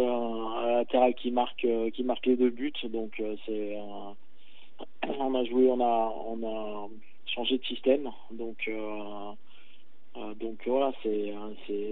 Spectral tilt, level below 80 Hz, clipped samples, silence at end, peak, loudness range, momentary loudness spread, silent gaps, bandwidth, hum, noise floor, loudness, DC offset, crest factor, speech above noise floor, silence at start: -2.5 dB/octave; -86 dBFS; under 0.1%; 0 s; -12 dBFS; 6 LU; 17 LU; none; 4.2 kHz; none; -63 dBFS; -30 LUFS; 2%; 18 dB; 33 dB; 0 s